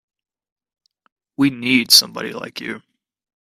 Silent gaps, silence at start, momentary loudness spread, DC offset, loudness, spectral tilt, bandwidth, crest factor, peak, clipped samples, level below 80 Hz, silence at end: none; 1.4 s; 21 LU; under 0.1%; -14 LUFS; -2 dB/octave; 16 kHz; 22 dB; 0 dBFS; under 0.1%; -64 dBFS; 0.7 s